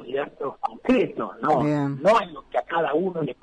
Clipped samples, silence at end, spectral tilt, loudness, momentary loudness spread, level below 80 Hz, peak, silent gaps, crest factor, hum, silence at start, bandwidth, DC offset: under 0.1%; 0.1 s; -7 dB/octave; -24 LUFS; 10 LU; -58 dBFS; -10 dBFS; none; 14 dB; none; 0 s; 10.5 kHz; under 0.1%